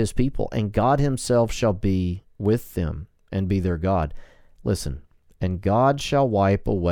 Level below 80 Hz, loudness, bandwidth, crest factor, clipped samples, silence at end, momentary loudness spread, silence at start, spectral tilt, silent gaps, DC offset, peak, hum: -36 dBFS; -23 LUFS; 18 kHz; 16 dB; under 0.1%; 0 s; 10 LU; 0 s; -6.5 dB/octave; none; under 0.1%; -8 dBFS; none